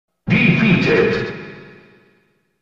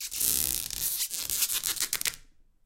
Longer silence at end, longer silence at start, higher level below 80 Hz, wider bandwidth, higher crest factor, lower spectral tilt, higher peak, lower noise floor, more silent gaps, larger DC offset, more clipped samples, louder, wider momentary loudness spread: first, 1 s vs 0.45 s; first, 0.25 s vs 0 s; first, -46 dBFS vs -54 dBFS; second, 7.4 kHz vs 17 kHz; second, 16 dB vs 30 dB; first, -7.5 dB/octave vs 1 dB/octave; about the same, -4 dBFS vs -2 dBFS; first, -60 dBFS vs -55 dBFS; neither; neither; neither; first, -15 LUFS vs -27 LUFS; first, 18 LU vs 5 LU